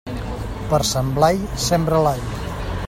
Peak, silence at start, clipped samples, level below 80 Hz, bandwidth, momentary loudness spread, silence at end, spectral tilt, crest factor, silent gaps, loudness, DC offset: -2 dBFS; 0.05 s; under 0.1%; -32 dBFS; 16.5 kHz; 11 LU; 0 s; -5 dB/octave; 18 dB; none; -20 LUFS; under 0.1%